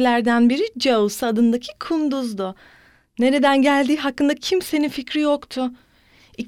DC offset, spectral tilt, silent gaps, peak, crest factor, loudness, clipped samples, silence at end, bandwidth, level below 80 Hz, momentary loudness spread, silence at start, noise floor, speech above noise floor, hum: under 0.1%; -4 dB/octave; none; -4 dBFS; 16 dB; -20 LUFS; under 0.1%; 0 s; 16 kHz; -58 dBFS; 11 LU; 0 s; -53 dBFS; 34 dB; none